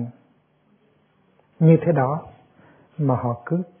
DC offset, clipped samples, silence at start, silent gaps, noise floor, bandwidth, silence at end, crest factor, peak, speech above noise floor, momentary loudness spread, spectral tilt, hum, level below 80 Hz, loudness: under 0.1%; under 0.1%; 0 s; none; -62 dBFS; 3.5 kHz; 0.15 s; 20 dB; -4 dBFS; 42 dB; 15 LU; -13.5 dB/octave; none; -62 dBFS; -21 LUFS